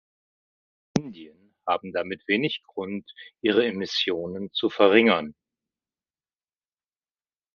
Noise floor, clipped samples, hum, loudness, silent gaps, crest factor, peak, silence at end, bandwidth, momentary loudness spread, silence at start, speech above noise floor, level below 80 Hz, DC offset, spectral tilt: under -90 dBFS; under 0.1%; none; -24 LUFS; none; 26 dB; -2 dBFS; 2.25 s; 7.2 kHz; 15 LU; 0.95 s; over 65 dB; -66 dBFS; under 0.1%; -5 dB/octave